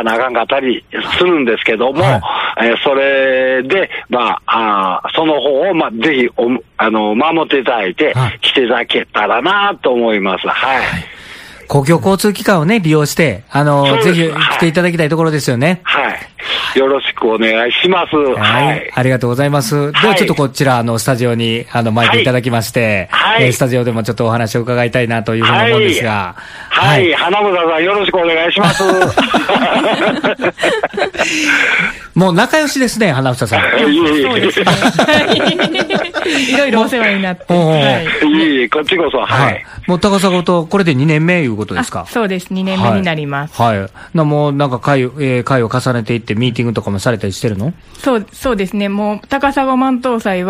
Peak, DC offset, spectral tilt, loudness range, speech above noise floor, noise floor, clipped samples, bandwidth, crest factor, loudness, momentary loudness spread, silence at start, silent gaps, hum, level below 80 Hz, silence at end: 0 dBFS; under 0.1%; -5 dB/octave; 3 LU; 21 dB; -33 dBFS; under 0.1%; 15.5 kHz; 12 dB; -12 LUFS; 6 LU; 0 s; none; none; -44 dBFS; 0 s